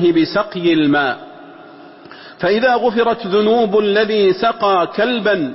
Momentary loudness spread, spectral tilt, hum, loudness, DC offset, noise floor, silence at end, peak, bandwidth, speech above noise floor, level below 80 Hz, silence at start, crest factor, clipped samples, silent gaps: 4 LU; -9 dB/octave; none; -15 LUFS; under 0.1%; -39 dBFS; 0 s; -4 dBFS; 5.8 kHz; 24 dB; -54 dBFS; 0 s; 12 dB; under 0.1%; none